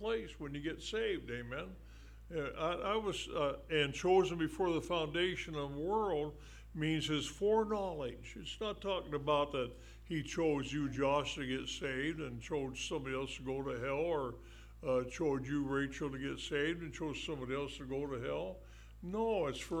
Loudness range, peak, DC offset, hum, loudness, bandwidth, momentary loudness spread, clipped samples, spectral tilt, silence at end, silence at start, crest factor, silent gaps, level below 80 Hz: 4 LU; -20 dBFS; under 0.1%; none; -38 LUFS; 15.5 kHz; 11 LU; under 0.1%; -5 dB/octave; 0 s; 0 s; 18 dB; none; -54 dBFS